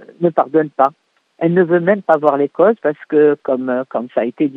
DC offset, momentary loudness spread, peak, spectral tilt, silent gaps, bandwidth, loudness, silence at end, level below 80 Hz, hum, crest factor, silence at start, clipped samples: under 0.1%; 6 LU; 0 dBFS; -10 dB/octave; none; 4.1 kHz; -16 LUFS; 0 s; -72 dBFS; none; 16 dB; 0.2 s; under 0.1%